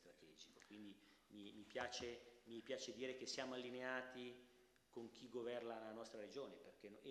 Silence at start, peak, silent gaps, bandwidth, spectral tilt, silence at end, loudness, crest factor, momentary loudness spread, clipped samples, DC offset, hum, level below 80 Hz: 0 s; -32 dBFS; none; 12.5 kHz; -3 dB/octave; 0 s; -53 LUFS; 22 dB; 15 LU; under 0.1%; under 0.1%; none; -86 dBFS